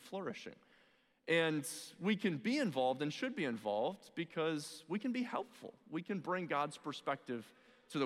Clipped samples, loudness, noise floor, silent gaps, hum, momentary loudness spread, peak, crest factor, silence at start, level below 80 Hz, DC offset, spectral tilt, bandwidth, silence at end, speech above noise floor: under 0.1%; -39 LUFS; -72 dBFS; none; none; 11 LU; -20 dBFS; 20 dB; 0 s; -88 dBFS; under 0.1%; -5 dB/octave; 15.5 kHz; 0 s; 33 dB